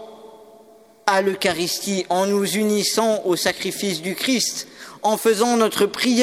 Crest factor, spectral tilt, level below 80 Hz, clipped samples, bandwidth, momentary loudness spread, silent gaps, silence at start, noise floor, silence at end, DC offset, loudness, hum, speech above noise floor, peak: 20 dB; -3 dB/octave; -64 dBFS; under 0.1%; 17 kHz; 6 LU; none; 0 s; -49 dBFS; 0 s; under 0.1%; -20 LUFS; none; 29 dB; 0 dBFS